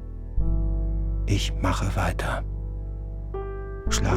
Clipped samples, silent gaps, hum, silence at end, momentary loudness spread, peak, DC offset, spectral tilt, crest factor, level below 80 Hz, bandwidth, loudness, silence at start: under 0.1%; none; 50 Hz at -30 dBFS; 0 s; 9 LU; -8 dBFS; under 0.1%; -5 dB/octave; 16 dB; -28 dBFS; 14 kHz; -29 LUFS; 0 s